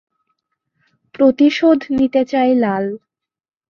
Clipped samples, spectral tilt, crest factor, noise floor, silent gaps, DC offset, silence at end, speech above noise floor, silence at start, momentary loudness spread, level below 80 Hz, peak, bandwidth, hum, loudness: under 0.1%; -6.5 dB/octave; 14 dB; -71 dBFS; none; under 0.1%; 0.75 s; 57 dB; 1.2 s; 10 LU; -54 dBFS; -2 dBFS; 7 kHz; none; -15 LUFS